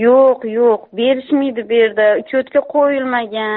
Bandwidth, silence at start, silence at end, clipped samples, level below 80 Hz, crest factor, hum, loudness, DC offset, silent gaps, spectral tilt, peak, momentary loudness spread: 4.2 kHz; 0 s; 0 s; under 0.1%; -64 dBFS; 12 dB; none; -15 LUFS; under 0.1%; none; -2.5 dB/octave; -2 dBFS; 5 LU